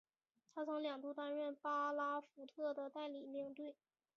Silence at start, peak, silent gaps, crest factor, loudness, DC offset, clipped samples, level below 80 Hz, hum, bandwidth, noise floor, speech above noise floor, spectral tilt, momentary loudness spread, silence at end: 0.55 s; -32 dBFS; none; 14 dB; -45 LUFS; under 0.1%; under 0.1%; under -90 dBFS; none; 6.8 kHz; -82 dBFS; 37 dB; -1 dB/octave; 11 LU; 0.45 s